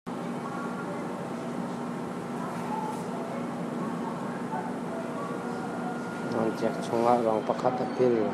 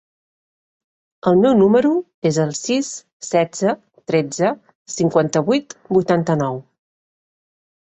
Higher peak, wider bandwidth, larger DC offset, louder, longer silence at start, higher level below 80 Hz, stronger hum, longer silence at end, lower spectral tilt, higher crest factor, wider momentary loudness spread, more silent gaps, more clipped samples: second, -8 dBFS vs -2 dBFS; first, 13.5 kHz vs 8.4 kHz; neither; second, -31 LUFS vs -18 LUFS; second, 0.05 s vs 1.25 s; second, -70 dBFS vs -58 dBFS; neither; second, 0 s vs 1.3 s; about the same, -6.5 dB/octave vs -5.5 dB/octave; first, 22 dB vs 16 dB; second, 9 LU vs 12 LU; second, none vs 2.14-2.22 s, 3.13-3.20 s, 4.75-4.86 s; neither